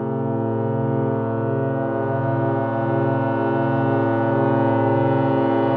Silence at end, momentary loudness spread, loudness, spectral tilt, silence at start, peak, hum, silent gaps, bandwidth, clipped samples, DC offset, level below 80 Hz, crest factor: 0 s; 4 LU; -21 LUFS; -11.5 dB/octave; 0 s; -6 dBFS; none; none; 4.7 kHz; under 0.1%; under 0.1%; -56 dBFS; 12 dB